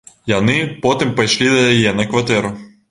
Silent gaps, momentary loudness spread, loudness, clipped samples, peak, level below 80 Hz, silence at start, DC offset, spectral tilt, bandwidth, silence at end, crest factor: none; 7 LU; -15 LUFS; under 0.1%; -2 dBFS; -46 dBFS; 0.25 s; under 0.1%; -4.5 dB/octave; 11.5 kHz; 0.25 s; 14 dB